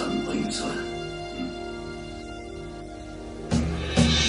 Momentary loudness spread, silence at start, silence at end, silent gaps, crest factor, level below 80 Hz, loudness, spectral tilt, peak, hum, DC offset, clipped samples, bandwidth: 13 LU; 0 s; 0 s; none; 20 dB; -38 dBFS; -30 LUFS; -4.5 dB/octave; -8 dBFS; 50 Hz at -45 dBFS; under 0.1%; under 0.1%; 10.5 kHz